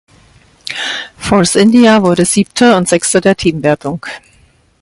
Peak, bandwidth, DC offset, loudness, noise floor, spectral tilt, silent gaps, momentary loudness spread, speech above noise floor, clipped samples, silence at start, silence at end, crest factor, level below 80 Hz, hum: 0 dBFS; 11.5 kHz; under 0.1%; -11 LUFS; -49 dBFS; -4.5 dB/octave; none; 16 LU; 39 dB; under 0.1%; 0.65 s; 0.65 s; 12 dB; -42 dBFS; none